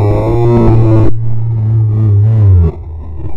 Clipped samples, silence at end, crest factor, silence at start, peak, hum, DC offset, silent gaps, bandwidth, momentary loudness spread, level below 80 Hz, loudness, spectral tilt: 0.4%; 0 s; 8 dB; 0 s; 0 dBFS; none; under 0.1%; none; 4.1 kHz; 9 LU; -20 dBFS; -10 LUFS; -11 dB/octave